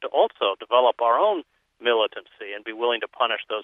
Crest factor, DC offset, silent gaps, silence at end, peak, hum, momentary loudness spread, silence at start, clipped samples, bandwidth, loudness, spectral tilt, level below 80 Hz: 18 dB; under 0.1%; none; 0 s; -4 dBFS; none; 13 LU; 0 s; under 0.1%; 3.9 kHz; -23 LUFS; -4.5 dB/octave; -78 dBFS